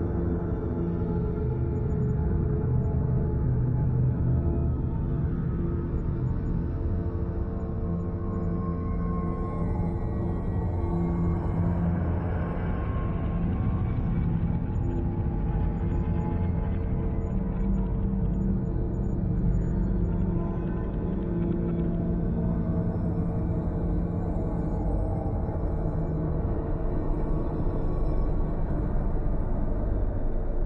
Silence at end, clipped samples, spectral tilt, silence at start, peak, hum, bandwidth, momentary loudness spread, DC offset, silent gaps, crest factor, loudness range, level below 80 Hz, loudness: 0 s; under 0.1%; -11.5 dB/octave; 0 s; -14 dBFS; none; 3.8 kHz; 4 LU; under 0.1%; none; 12 dB; 3 LU; -30 dBFS; -29 LUFS